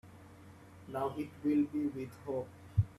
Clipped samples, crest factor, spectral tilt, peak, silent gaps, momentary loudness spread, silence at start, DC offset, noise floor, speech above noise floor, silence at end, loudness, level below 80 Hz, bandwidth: under 0.1%; 20 dB; -9 dB/octave; -18 dBFS; none; 24 LU; 0.05 s; under 0.1%; -55 dBFS; 20 dB; 0.05 s; -37 LUFS; -58 dBFS; 13 kHz